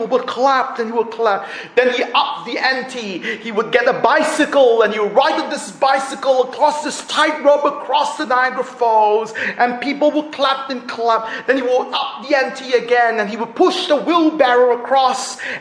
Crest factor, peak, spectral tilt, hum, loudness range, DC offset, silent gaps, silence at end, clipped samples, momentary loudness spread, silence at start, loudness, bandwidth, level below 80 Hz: 16 dB; 0 dBFS; -3 dB/octave; none; 2 LU; under 0.1%; none; 0 s; under 0.1%; 8 LU; 0 s; -16 LUFS; 10.5 kHz; -66 dBFS